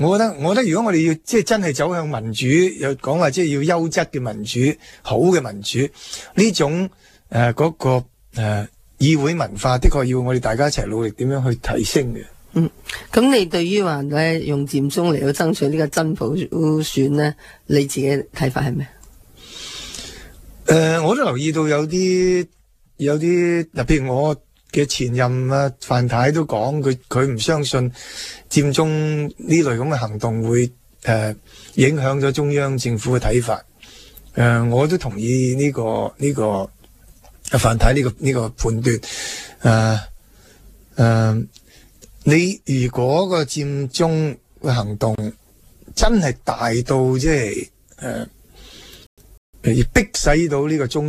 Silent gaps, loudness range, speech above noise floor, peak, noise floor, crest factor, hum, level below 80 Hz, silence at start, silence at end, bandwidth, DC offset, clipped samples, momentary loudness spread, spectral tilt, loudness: 49.06-49.17 s, 49.37-49.53 s; 2 LU; 30 dB; 0 dBFS; -48 dBFS; 18 dB; none; -32 dBFS; 0 s; 0 s; 15 kHz; under 0.1%; under 0.1%; 10 LU; -5.5 dB/octave; -19 LUFS